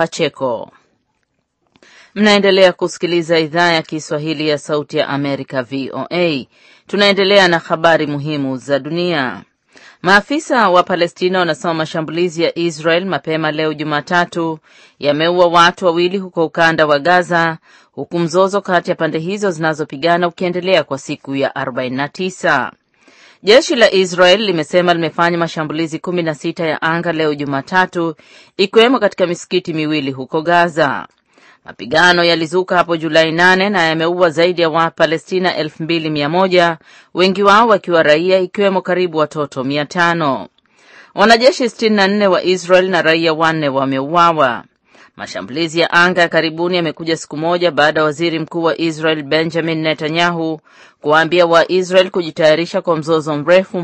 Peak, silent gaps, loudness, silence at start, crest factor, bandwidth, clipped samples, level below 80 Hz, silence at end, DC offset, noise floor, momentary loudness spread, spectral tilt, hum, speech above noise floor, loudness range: 0 dBFS; none; -14 LUFS; 0 s; 14 dB; 10.5 kHz; under 0.1%; -58 dBFS; 0 s; under 0.1%; -67 dBFS; 10 LU; -5 dB/octave; none; 53 dB; 4 LU